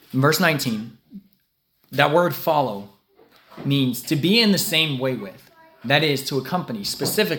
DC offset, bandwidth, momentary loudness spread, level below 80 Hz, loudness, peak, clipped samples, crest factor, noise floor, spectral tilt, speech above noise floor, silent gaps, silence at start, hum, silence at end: under 0.1%; 18 kHz; 14 LU; -64 dBFS; -21 LUFS; 0 dBFS; under 0.1%; 22 dB; -68 dBFS; -4.5 dB/octave; 48 dB; none; 0.15 s; none; 0 s